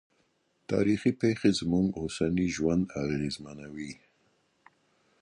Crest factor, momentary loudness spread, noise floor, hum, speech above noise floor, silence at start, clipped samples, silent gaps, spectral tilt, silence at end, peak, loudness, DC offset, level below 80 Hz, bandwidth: 18 dB; 15 LU; -72 dBFS; none; 43 dB; 0.7 s; under 0.1%; none; -6 dB/octave; 1.25 s; -12 dBFS; -29 LUFS; under 0.1%; -54 dBFS; 11.5 kHz